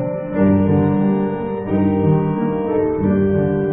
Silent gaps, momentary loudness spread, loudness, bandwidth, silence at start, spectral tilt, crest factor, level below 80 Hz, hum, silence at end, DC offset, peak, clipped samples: none; 5 LU; -17 LUFS; 3.4 kHz; 0 s; -14.5 dB/octave; 12 dB; -38 dBFS; none; 0 s; under 0.1%; -4 dBFS; under 0.1%